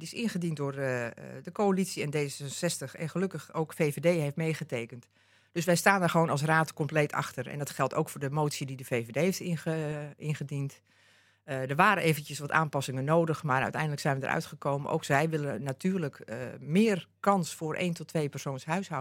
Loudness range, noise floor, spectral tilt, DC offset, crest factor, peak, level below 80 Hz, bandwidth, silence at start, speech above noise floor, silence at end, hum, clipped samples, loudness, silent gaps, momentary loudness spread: 4 LU; -63 dBFS; -5.5 dB/octave; under 0.1%; 24 dB; -6 dBFS; -74 dBFS; 16.5 kHz; 0 s; 32 dB; 0 s; none; under 0.1%; -30 LUFS; none; 11 LU